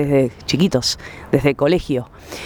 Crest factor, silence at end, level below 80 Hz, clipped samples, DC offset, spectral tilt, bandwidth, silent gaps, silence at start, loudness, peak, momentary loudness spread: 16 dB; 0 s; -40 dBFS; under 0.1%; under 0.1%; -5.5 dB/octave; over 20 kHz; none; 0 s; -18 LUFS; -2 dBFS; 8 LU